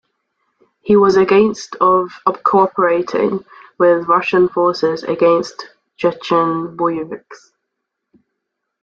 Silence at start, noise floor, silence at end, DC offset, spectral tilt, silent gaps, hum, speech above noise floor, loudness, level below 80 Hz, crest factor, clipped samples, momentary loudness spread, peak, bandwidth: 0.85 s; -76 dBFS; 1.5 s; under 0.1%; -6 dB/octave; none; none; 62 dB; -15 LUFS; -56 dBFS; 14 dB; under 0.1%; 11 LU; -2 dBFS; 7.6 kHz